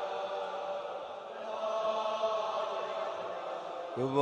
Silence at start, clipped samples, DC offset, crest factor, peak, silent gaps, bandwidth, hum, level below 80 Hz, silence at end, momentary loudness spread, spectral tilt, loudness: 0 s; under 0.1%; under 0.1%; 20 dB; -14 dBFS; none; 9.2 kHz; none; -82 dBFS; 0 s; 8 LU; -5 dB/octave; -36 LUFS